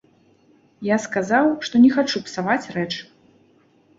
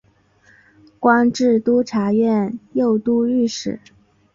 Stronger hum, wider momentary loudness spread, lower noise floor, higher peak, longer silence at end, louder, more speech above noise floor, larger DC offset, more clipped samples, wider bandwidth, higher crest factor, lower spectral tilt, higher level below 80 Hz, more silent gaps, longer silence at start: neither; first, 12 LU vs 8 LU; about the same, -57 dBFS vs -55 dBFS; about the same, -4 dBFS vs -2 dBFS; first, 0.95 s vs 0.6 s; about the same, -20 LUFS vs -18 LUFS; about the same, 38 dB vs 38 dB; neither; neither; about the same, 7.8 kHz vs 7.6 kHz; about the same, 18 dB vs 16 dB; about the same, -5 dB/octave vs -6 dB/octave; about the same, -62 dBFS vs -58 dBFS; neither; second, 0.8 s vs 1 s